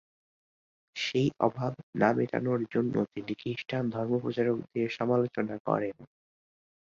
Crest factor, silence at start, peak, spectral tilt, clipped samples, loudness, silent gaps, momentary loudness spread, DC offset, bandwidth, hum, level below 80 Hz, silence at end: 22 dB; 0.95 s; -10 dBFS; -7 dB/octave; under 0.1%; -30 LUFS; 1.83-1.93 s, 5.60-5.65 s; 8 LU; under 0.1%; 7.6 kHz; none; -68 dBFS; 0.8 s